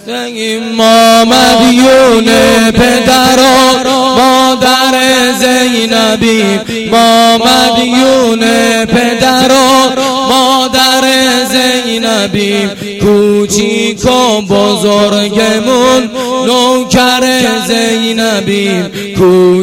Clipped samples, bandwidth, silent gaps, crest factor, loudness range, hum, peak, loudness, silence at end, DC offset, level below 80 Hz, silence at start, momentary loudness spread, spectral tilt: 0.3%; 17 kHz; none; 8 dB; 4 LU; none; 0 dBFS; -7 LUFS; 0 s; under 0.1%; -36 dBFS; 0.05 s; 6 LU; -3.5 dB/octave